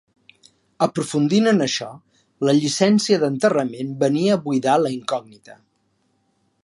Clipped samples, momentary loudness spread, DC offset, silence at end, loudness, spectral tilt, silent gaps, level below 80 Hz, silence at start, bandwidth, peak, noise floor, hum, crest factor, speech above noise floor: under 0.1%; 9 LU; under 0.1%; 1.15 s; -20 LUFS; -5 dB/octave; none; -68 dBFS; 0.8 s; 11.5 kHz; -4 dBFS; -67 dBFS; none; 18 dB; 47 dB